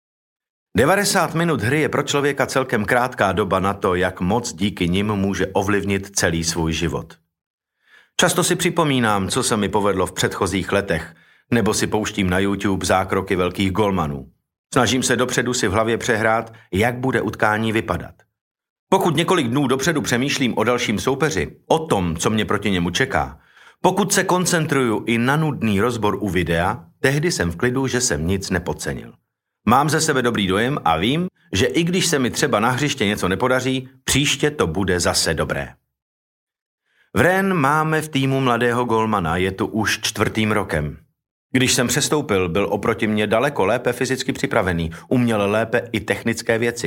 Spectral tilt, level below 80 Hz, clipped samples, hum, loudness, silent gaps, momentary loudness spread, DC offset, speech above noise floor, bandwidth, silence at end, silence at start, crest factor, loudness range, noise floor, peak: -4.5 dB/octave; -46 dBFS; under 0.1%; none; -19 LUFS; 7.46-7.58 s, 14.58-14.64 s, 18.41-18.55 s, 18.70-18.87 s, 36.02-36.47 s, 36.61-36.78 s, 41.31-41.50 s; 6 LU; under 0.1%; 35 dB; 16.5 kHz; 0 s; 0.75 s; 18 dB; 2 LU; -55 dBFS; -2 dBFS